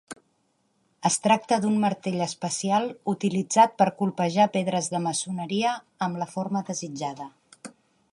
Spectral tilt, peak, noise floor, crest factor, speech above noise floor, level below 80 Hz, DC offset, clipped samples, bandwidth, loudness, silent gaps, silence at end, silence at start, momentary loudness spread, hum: -4.5 dB/octave; -6 dBFS; -70 dBFS; 20 dB; 45 dB; -72 dBFS; under 0.1%; under 0.1%; 11.5 kHz; -25 LUFS; none; 0.45 s; 0.1 s; 19 LU; none